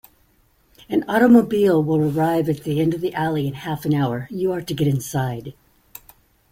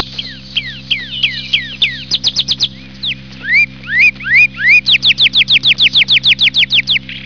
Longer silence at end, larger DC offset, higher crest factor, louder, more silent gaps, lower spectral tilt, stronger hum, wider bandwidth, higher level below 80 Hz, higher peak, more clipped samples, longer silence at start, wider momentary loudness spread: first, 1 s vs 0 s; second, under 0.1% vs 0.9%; first, 18 dB vs 12 dB; second, -20 LUFS vs -9 LUFS; neither; first, -7 dB/octave vs -1 dB/octave; neither; first, 16.5 kHz vs 5.4 kHz; second, -54 dBFS vs -42 dBFS; second, -4 dBFS vs 0 dBFS; neither; first, 0.9 s vs 0 s; about the same, 11 LU vs 12 LU